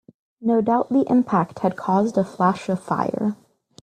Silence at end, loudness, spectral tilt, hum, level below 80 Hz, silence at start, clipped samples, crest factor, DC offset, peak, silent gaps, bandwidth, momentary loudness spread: 0.5 s; -21 LUFS; -8 dB/octave; none; -62 dBFS; 0.4 s; under 0.1%; 16 dB; under 0.1%; -6 dBFS; none; 9.8 kHz; 7 LU